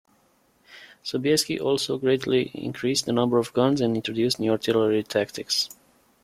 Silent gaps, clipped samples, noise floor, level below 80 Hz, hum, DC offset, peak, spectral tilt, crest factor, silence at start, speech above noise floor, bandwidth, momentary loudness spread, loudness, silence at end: none; under 0.1%; -63 dBFS; -64 dBFS; none; under 0.1%; -6 dBFS; -4.5 dB/octave; 18 dB; 0.7 s; 40 dB; 16 kHz; 6 LU; -24 LUFS; 0.55 s